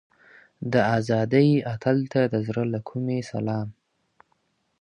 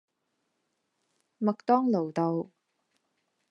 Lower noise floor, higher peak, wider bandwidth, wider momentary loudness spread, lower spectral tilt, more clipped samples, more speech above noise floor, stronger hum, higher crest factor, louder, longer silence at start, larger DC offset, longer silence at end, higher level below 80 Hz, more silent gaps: second, -70 dBFS vs -79 dBFS; first, -6 dBFS vs -10 dBFS; first, 10.5 kHz vs 7.4 kHz; about the same, 10 LU vs 9 LU; about the same, -8 dB/octave vs -9 dB/octave; neither; second, 47 dB vs 52 dB; neither; about the same, 18 dB vs 22 dB; first, -24 LUFS vs -28 LUFS; second, 0.6 s vs 1.4 s; neither; about the same, 1.1 s vs 1.05 s; first, -60 dBFS vs -86 dBFS; neither